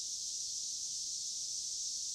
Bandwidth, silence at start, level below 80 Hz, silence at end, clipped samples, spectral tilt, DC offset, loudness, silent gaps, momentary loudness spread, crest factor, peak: 16 kHz; 0 s; -78 dBFS; 0 s; under 0.1%; 3 dB/octave; under 0.1%; -37 LUFS; none; 1 LU; 14 dB; -28 dBFS